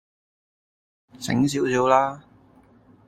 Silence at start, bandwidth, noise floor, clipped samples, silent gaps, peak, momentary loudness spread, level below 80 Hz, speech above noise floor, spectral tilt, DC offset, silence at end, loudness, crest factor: 1.2 s; 14.5 kHz; -55 dBFS; under 0.1%; none; -4 dBFS; 15 LU; -60 dBFS; 34 dB; -5.5 dB/octave; under 0.1%; 0.9 s; -22 LUFS; 22 dB